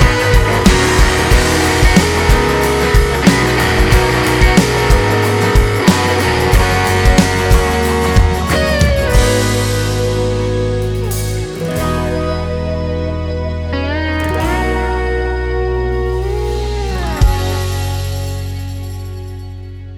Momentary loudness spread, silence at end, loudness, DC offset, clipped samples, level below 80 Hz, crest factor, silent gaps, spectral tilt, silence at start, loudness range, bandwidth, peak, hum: 9 LU; 0 s; -14 LUFS; under 0.1%; under 0.1%; -18 dBFS; 12 dB; none; -5 dB/octave; 0 s; 7 LU; 19.5 kHz; 0 dBFS; none